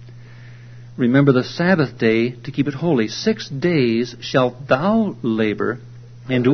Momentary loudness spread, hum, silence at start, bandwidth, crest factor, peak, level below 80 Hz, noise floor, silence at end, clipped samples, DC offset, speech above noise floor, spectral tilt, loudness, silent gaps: 7 LU; none; 0 s; 6.4 kHz; 18 dB; 0 dBFS; -54 dBFS; -39 dBFS; 0 s; under 0.1%; under 0.1%; 21 dB; -7 dB/octave; -19 LUFS; none